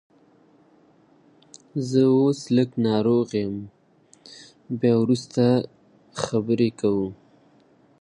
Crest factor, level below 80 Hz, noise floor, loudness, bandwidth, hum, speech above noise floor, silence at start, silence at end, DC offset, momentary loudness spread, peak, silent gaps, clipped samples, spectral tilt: 18 dB; -62 dBFS; -58 dBFS; -23 LUFS; 10.5 kHz; none; 36 dB; 1.75 s; 0.9 s; under 0.1%; 16 LU; -6 dBFS; none; under 0.1%; -7 dB/octave